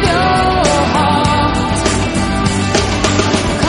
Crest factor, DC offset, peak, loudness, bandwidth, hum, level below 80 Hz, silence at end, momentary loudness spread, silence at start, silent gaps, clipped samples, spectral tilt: 12 dB; under 0.1%; 0 dBFS; -13 LUFS; 11 kHz; none; -24 dBFS; 0 s; 3 LU; 0 s; none; under 0.1%; -4.5 dB/octave